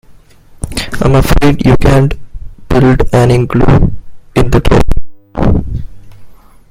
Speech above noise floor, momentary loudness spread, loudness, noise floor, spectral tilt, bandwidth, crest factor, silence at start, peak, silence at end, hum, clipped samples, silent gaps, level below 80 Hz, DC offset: 31 dB; 14 LU; -11 LUFS; -38 dBFS; -7 dB/octave; 16.5 kHz; 10 dB; 0.65 s; 0 dBFS; 0.4 s; none; 0.7%; none; -18 dBFS; under 0.1%